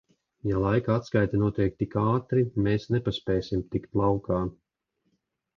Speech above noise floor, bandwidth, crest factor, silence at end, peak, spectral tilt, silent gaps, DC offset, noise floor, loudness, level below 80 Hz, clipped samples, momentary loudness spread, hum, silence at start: 52 dB; 7 kHz; 18 dB; 1.05 s; -10 dBFS; -8.5 dB/octave; none; under 0.1%; -77 dBFS; -27 LUFS; -46 dBFS; under 0.1%; 5 LU; none; 0.45 s